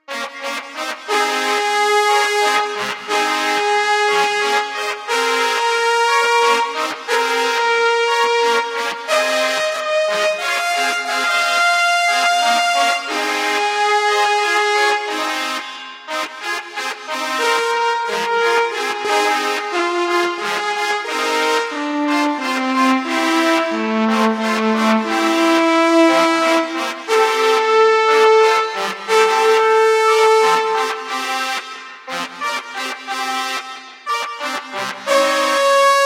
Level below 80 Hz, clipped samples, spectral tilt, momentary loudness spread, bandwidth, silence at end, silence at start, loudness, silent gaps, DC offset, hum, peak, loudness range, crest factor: -80 dBFS; under 0.1%; -2 dB/octave; 10 LU; 16 kHz; 0 s; 0.1 s; -16 LUFS; none; under 0.1%; none; -2 dBFS; 6 LU; 16 dB